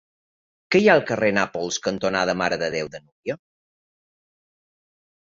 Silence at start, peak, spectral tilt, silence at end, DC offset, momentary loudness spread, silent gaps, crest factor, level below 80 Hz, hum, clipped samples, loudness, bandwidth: 0.7 s; -2 dBFS; -4 dB/octave; 2.05 s; under 0.1%; 15 LU; 3.12-3.23 s; 24 dB; -60 dBFS; none; under 0.1%; -21 LUFS; 7.8 kHz